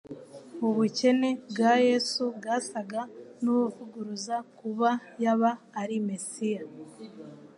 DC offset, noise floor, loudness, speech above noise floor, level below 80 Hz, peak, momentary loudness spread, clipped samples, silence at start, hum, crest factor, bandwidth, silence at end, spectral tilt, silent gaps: under 0.1%; -47 dBFS; -28 LUFS; 19 dB; -82 dBFS; -12 dBFS; 21 LU; under 0.1%; 0.1 s; none; 18 dB; 11 kHz; 0.1 s; -4.5 dB/octave; none